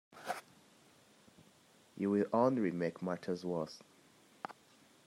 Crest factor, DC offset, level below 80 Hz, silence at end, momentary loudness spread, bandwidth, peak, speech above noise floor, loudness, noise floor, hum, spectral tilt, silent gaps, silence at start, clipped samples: 20 dB; under 0.1%; -84 dBFS; 0.55 s; 18 LU; 16 kHz; -18 dBFS; 31 dB; -37 LUFS; -66 dBFS; none; -7 dB/octave; none; 0.15 s; under 0.1%